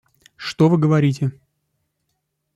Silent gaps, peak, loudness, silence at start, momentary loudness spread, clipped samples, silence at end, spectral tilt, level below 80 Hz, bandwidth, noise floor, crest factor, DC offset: none; -4 dBFS; -18 LUFS; 0.4 s; 15 LU; under 0.1%; 1.25 s; -7.5 dB/octave; -58 dBFS; 8.8 kHz; -74 dBFS; 16 dB; under 0.1%